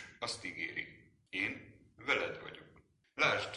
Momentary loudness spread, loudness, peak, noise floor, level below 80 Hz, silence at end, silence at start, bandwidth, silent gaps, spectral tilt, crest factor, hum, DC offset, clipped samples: 18 LU; -37 LUFS; -16 dBFS; -66 dBFS; -70 dBFS; 0 s; 0 s; 11.5 kHz; none; -3 dB/octave; 24 dB; none; under 0.1%; under 0.1%